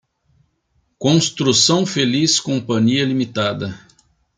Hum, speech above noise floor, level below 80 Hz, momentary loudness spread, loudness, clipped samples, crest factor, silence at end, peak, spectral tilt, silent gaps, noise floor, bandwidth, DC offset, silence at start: none; 48 dB; -58 dBFS; 8 LU; -17 LUFS; under 0.1%; 16 dB; 0.6 s; -2 dBFS; -4 dB/octave; none; -65 dBFS; 10 kHz; under 0.1%; 1 s